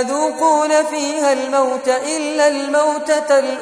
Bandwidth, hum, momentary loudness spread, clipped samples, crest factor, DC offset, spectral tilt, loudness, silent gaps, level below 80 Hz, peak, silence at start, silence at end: 11 kHz; none; 4 LU; under 0.1%; 14 dB; under 0.1%; -1 dB/octave; -16 LUFS; none; -68 dBFS; -2 dBFS; 0 s; 0 s